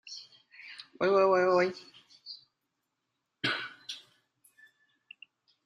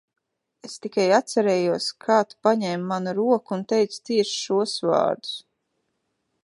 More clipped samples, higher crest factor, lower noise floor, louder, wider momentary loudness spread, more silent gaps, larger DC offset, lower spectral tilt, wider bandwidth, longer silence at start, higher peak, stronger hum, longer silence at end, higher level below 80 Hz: neither; about the same, 20 dB vs 20 dB; first, -83 dBFS vs -75 dBFS; second, -28 LUFS vs -23 LUFS; first, 26 LU vs 9 LU; neither; neither; about the same, -5 dB/octave vs -4.5 dB/octave; about the same, 11.5 kHz vs 11.5 kHz; second, 0.05 s vs 0.65 s; second, -14 dBFS vs -4 dBFS; neither; first, 1.7 s vs 1.05 s; about the same, -78 dBFS vs -76 dBFS